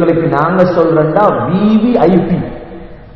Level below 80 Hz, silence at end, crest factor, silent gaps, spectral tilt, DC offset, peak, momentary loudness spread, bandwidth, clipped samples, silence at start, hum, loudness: -38 dBFS; 0.05 s; 10 dB; none; -10 dB/octave; 0.8%; 0 dBFS; 11 LU; 6 kHz; 0.4%; 0 s; none; -11 LUFS